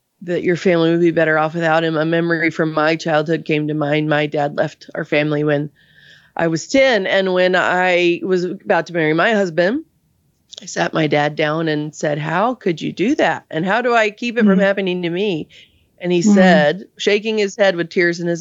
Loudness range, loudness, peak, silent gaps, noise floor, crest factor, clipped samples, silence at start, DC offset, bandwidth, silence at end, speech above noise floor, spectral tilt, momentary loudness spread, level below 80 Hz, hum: 4 LU; -17 LUFS; 0 dBFS; none; -61 dBFS; 16 dB; under 0.1%; 0.2 s; under 0.1%; 8 kHz; 0 s; 45 dB; -5.5 dB/octave; 8 LU; -62 dBFS; none